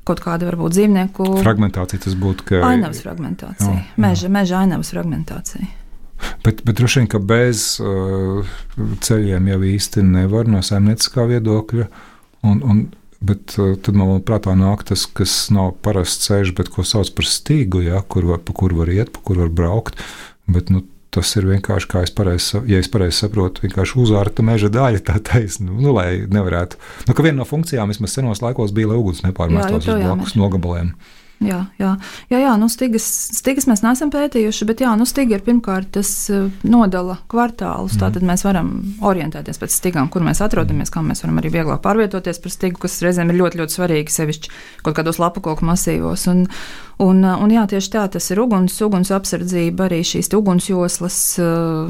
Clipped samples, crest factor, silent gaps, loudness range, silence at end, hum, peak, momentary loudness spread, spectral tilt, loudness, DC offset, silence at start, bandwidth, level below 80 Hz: under 0.1%; 14 dB; none; 2 LU; 0 s; none; -2 dBFS; 8 LU; -5.5 dB/octave; -17 LUFS; under 0.1%; 0.05 s; 16.5 kHz; -32 dBFS